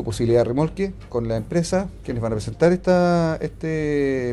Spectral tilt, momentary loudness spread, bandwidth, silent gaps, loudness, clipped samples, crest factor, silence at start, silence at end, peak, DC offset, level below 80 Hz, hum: -7 dB/octave; 9 LU; 12 kHz; none; -22 LUFS; under 0.1%; 16 dB; 0 s; 0 s; -6 dBFS; under 0.1%; -40 dBFS; none